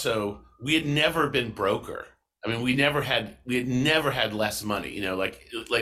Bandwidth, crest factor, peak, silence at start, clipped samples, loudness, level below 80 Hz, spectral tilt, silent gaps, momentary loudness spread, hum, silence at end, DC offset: 15.5 kHz; 18 dB; -8 dBFS; 0 s; under 0.1%; -26 LUFS; -54 dBFS; -4.5 dB/octave; none; 13 LU; none; 0 s; under 0.1%